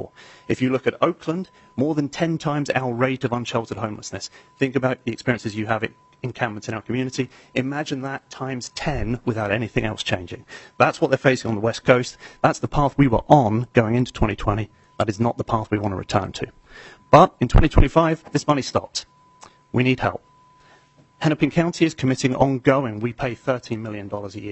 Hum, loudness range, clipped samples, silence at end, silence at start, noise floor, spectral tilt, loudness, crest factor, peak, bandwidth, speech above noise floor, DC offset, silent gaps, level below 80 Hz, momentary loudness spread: none; 7 LU; under 0.1%; 0 s; 0 s; -54 dBFS; -6 dB/octave; -22 LUFS; 22 dB; 0 dBFS; 8.4 kHz; 33 dB; under 0.1%; none; -34 dBFS; 13 LU